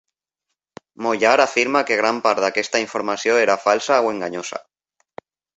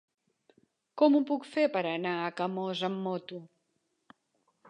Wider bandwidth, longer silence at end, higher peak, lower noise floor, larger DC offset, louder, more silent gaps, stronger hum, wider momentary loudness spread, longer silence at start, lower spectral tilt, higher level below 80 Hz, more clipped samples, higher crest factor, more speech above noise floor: second, 8.2 kHz vs 10 kHz; second, 1 s vs 1.25 s; first, -2 dBFS vs -12 dBFS; about the same, -80 dBFS vs -78 dBFS; neither; first, -19 LUFS vs -30 LUFS; neither; neither; second, 11 LU vs 16 LU; about the same, 1 s vs 0.95 s; second, -2.5 dB/octave vs -6.5 dB/octave; first, -66 dBFS vs -88 dBFS; neither; about the same, 20 dB vs 20 dB; first, 62 dB vs 49 dB